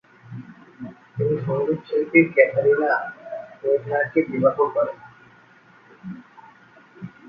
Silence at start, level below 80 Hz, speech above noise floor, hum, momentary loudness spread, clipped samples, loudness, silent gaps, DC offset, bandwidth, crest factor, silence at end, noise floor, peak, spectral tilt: 0.3 s; -66 dBFS; 32 dB; none; 23 LU; under 0.1%; -21 LUFS; none; under 0.1%; 5.2 kHz; 22 dB; 0 s; -52 dBFS; -2 dBFS; -10 dB/octave